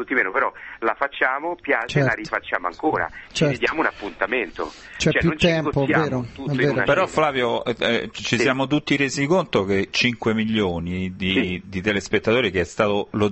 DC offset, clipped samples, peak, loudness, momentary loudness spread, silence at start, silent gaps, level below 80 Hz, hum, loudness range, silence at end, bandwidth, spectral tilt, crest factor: under 0.1%; under 0.1%; -4 dBFS; -21 LUFS; 7 LU; 0 s; none; -46 dBFS; none; 2 LU; 0 s; 8.4 kHz; -5 dB/octave; 18 dB